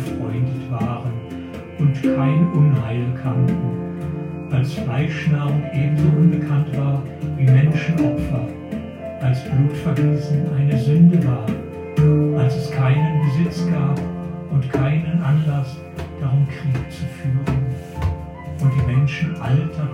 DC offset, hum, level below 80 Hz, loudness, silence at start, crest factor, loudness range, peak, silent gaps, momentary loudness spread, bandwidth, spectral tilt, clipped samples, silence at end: under 0.1%; none; -40 dBFS; -20 LUFS; 0 s; 16 dB; 4 LU; -4 dBFS; none; 12 LU; 10 kHz; -9 dB/octave; under 0.1%; 0 s